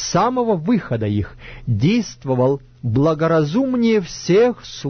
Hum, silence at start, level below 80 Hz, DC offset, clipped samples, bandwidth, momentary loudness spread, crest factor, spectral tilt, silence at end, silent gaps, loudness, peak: none; 0 s; -44 dBFS; under 0.1%; under 0.1%; 6.6 kHz; 8 LU; 12 dB; -6.5 dB/octave; 0 s; none; -18 LUFS; -6 dBFS